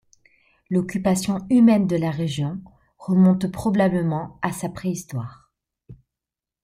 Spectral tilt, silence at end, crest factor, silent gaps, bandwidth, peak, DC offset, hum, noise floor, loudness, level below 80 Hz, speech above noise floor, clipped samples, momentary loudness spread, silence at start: -7 dB/octave; 0.7 s; 16 dB; none; 15 kHz; -6 dBFS; under 0.1%; none; -88 dBFS; -22 LUFS; -54 dBFS; 68 dB; under 0.1%; 14 LU; 0.7 s